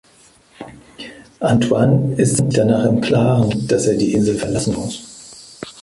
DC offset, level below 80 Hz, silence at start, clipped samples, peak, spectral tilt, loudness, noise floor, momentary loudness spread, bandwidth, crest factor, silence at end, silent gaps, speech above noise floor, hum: under 0.1%; -44 dBFS; 0.6 s; under 0.1%; -2 dBFS; -6 dB/octave; -16 LUFS; -50 dBFS; 21 LU; 11.5 kHz; 16 dB; 0 s; none; 35 dB; none